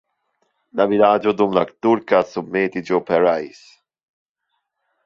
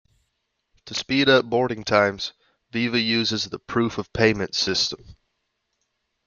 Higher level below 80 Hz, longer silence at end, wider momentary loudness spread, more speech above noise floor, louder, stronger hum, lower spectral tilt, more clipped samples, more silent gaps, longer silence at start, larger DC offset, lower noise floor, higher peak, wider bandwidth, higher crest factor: second, -62 dBFS vs -54 dBFS; first, 1.6 s vs 1.15 s; second, 8 LU vs 13 LU; first, 57 dB vs 53 dB; first, -18 LUFS vs -22 LUFS; neither; first, -7 dB/octave vs -4 dB/octave; neither; neither; about the same, 0.75 s vs 0.85 s; neither; about the same, -75 dBFS vs -76 dBFS; about the same, -2 dBFS vs -4 dBFS; about the same, 7.4 kHz vs 7.2 kHz; about the same, 18 dB vs 22 dB